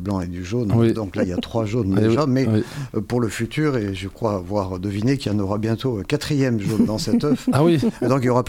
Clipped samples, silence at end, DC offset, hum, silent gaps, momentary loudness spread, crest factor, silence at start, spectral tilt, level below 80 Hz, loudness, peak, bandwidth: under 0.1%; 0 s; under 0.1%; none; none; 7 LU; 16 dB; 0 s; -7 dB/octave; -44 dBFS; -21 LUFS; -4 dBFS; 16 kHz